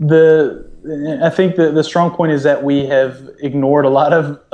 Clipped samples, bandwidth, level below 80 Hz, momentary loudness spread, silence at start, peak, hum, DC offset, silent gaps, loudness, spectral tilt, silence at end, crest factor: under 0.1%; 8.8 kHz; -48 dBFS; 11 LU; 0 s; 0 dBFS; none; under 0.1%; none; -14 LUFS; -7.5 dB/octave; 0.15 s; 12 dB